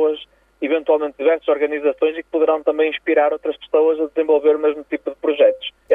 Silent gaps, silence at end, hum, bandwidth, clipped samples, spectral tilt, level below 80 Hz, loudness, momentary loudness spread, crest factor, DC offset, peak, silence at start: none; 0 s; none; 3.8 kHz; under 0.1%; -5.5 dB/octave; -62 dBFS; -18 LUFS; 8 LU; 14 dB; under 0.1%; -4 dBFS; 0 s